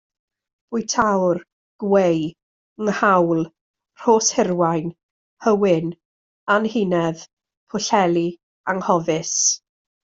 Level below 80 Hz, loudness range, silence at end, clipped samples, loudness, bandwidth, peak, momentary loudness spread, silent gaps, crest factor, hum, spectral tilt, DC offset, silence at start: -60 dBFS; 2 LU; 0.6 s; under 0.1%; -20 LUFS; 8 kHz; -2 dBFS; 13 LU; 1.52-1.79 s, 2.43-2.76 s, 3.61-3.74 s, 5.03-5.37 s, 6.05-6.47 s, 7.33-7.37 s, 7.57-7.67 s, 8.43-8.64 s; 18 dB; none; -4 dB/octave; under 0.1%; 0.7 s